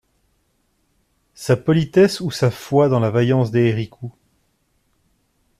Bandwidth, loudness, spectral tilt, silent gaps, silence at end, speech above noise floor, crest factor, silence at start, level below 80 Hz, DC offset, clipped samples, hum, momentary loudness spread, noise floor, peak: 14.5 kHz; -18 LUFS; -7 dB/octave; none; 1.5 s; 49 dB; 16 dB; 1.4 s; -54 dBFS; under 0.1%; under 0.1%; none; 15 LU; -66 dBFS; -4 dBFS